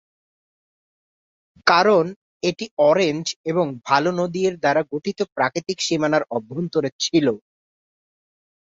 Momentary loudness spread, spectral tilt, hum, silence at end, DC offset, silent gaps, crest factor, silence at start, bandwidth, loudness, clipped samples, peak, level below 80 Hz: 9 LU; -4.5 dB/octave; none; 1.25 s; under 0.1%; 2.16-2.40 s, 2.71-2.77 s, 3.36-3.44 s, 6.92-6.99 s; 22 dB; 1.65 s; 8 kHz; -21 LUFS; under 0.1%; 0 dBFS; -64 dBFS